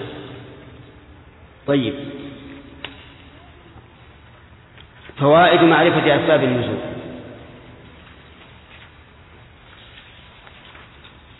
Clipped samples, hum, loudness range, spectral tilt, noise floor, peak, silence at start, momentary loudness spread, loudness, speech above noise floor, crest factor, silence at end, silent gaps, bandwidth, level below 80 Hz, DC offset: under 0.1%; none; 18 LU; -9.5 dB/octave; -46 dBFS; -2 dBFS; 0 s; 29 LU; -16 LUFS; 31 dB; 20 dB; 3.95 s; none; 4.1 kHz; -52 dBFS; under 0.1%